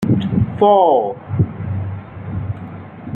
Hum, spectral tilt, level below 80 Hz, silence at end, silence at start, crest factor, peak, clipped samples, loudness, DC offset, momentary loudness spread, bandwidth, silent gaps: none; -10 dB/octave; -42 dBFS; 0 s; 0 s; 16 dB; -2 dBFS; under 0.1%; -17 LUFS; under 0.1%; 18 LU; 4.7 kHz; none